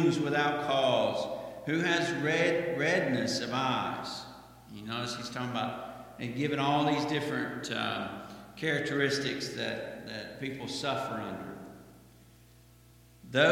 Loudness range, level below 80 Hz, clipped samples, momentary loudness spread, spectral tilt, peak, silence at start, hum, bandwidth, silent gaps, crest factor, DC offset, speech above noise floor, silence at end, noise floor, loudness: 8 LU; -66 dBFS; under 0.1%; 14 LU; -4.5 dB/octave; -10 dBFS; 0 s; 60 Hz at -60 dBFS; 16.5 kHz; none; 22 dB; under 0.1%; 27 dB; 0 s; -58 dBFS; -31 LUFS